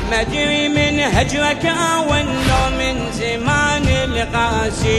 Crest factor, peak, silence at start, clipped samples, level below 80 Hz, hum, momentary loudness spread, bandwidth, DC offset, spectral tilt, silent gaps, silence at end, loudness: 14 dB; -4 dBFS; 0 s; under 0.1%; -28 dBFS; none; 4 LU; 12.5 kHz; under 0.1%; -4.5 dB/octave; none; 0 s; -16 LUFS